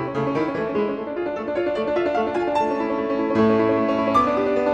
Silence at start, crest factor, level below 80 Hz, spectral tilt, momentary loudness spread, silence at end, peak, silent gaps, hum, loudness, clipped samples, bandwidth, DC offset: 0 s; 14 dB; -52 dBFS; -7 dB/octave; 7 LU; 0 s; -6 dBFS; none; none; -22 LUFS; under 0.1%; 9.4 kHz; under 0.1%